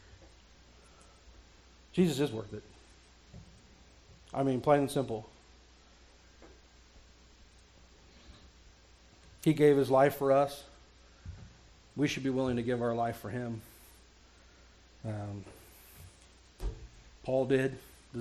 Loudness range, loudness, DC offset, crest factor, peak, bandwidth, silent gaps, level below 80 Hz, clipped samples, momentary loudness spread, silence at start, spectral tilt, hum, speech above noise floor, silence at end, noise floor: 14 LU; -31 LUFS; under 0.1%; 22 dB; -12 dBFS; 16 kHz; none; -56 dBFS; under 0.1%; 27 LU; 1.25 s; -6.5 dB/octave; none; 30 dB; 0 s; -59 dBFS